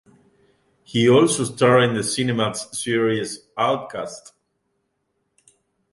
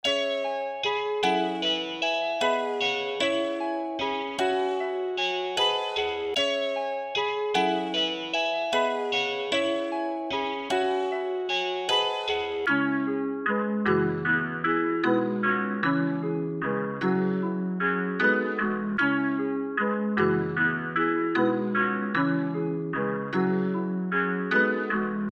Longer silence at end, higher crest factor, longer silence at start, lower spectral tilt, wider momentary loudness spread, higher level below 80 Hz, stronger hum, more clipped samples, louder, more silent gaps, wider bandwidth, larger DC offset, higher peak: first, 1.75 s vs 0 s; about the same, 18 dB vs 16 dB; first, 0.9 s vs 0.05 s; about the same, -4.5 dB/octave vs -5 dB/octave; first, 15 LU vs 5 LU; about the same, -62 dBFS vs -66 dBFS; neither; neither; first, -20 LUFS vs -26 LUFS; neither; about the same, 11.5 kHz vs 12 kHz; neither; first, -4 dBFS vs -12 dBFS